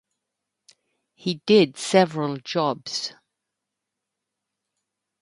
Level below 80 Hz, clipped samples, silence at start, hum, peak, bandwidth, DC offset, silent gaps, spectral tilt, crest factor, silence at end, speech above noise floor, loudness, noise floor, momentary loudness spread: -72 dBFS; under 0.1%; 1.25 s; none; -4 dBFS; 11.5 kHz; under 0.1%; none; -5 dB/octave; 22 dB; 2.1 s; 62 dB; -22 LUFS; -84 dBFS; 12 LU